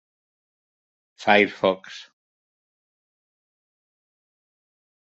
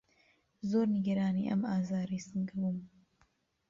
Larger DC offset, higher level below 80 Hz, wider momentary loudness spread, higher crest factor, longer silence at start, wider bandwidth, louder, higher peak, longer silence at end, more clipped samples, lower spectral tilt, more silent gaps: neither; about the same, -72 dBFS vs -70 dBFS; first, 22 LU vs 7 LU; first, 26 dB vs 14 dB; first, 1.2 s vs 0.65 s; about the same, 8 kHz vs 7.4 kHz; first, -21 LUFS vs -34 LUFS; first, -2 dBFS vs -20 dBFS; first, 3.15 s vs 0.8 s; neither; second, -5 dB/octave vs -8 dB/octave; neither